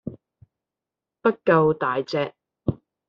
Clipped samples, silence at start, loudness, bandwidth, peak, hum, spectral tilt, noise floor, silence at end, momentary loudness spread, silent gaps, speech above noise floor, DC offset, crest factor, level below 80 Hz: under 0.1%; 0.05 s; -23 LUFS; 7 kHz; -4 dBFS; none; -5.5 dB/octave; -88 dBFS; 0.35 s; 12 LU; none; 67 dB; under 0.1%; 22 dB; -56 dBFS